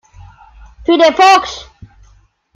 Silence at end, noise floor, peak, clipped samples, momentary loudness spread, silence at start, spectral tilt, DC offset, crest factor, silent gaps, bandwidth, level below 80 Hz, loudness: 0.95 s; -49 dBFS; 0 dBFS; under 0.1%; 18 LU; 0.8 s; -3 dB/octave; under 0.1%; 14 dB; none; 14 kHz; -42 dBFS; -10 LUFS